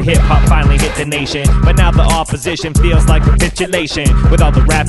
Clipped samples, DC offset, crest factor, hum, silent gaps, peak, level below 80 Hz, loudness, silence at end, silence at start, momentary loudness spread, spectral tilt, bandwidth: under 0.1%; under 0.1%; 10 dB; none; none; 0 dBFS; -12 dBFS; -12 LUFS; 0 s; 0 s; 5 LU; -5.5 dB/octave; 12 kHz